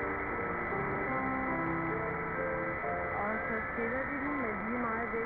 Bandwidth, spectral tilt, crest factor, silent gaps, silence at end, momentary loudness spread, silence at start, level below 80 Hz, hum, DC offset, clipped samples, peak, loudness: over 20 kHz; -10.5 dB/octave; 10 dB; none; 0 s; 2 LU; 0 s; -52 dBFS; none; under 0.1%; under 0.1%; -24 dBFS; -34 LUFS